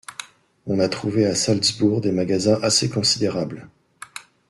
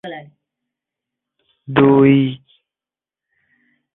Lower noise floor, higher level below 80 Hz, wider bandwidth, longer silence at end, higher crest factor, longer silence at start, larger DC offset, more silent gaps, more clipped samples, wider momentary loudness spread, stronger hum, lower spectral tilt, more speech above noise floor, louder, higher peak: second, -41 dBFS vs under -90 dBFS; about the same, -58 dBFS vs -58 dBFS; first, 12.5 kHz vs 4 kHz; second, 0.3 s vs 1.6 s; about the same, 16 dB vs 18 dB; about the same, 0.1 s vs 0.05 s; neither; neither; neither; second, 20 LU vs 24 LU; neither; second, -4 dB/octave vs -10.5 dB/octave; second, 20 dB vs over 76 dB; second, -20 LUFS vs -14 LUFS; second, -6 dBFS vs -2 dBFS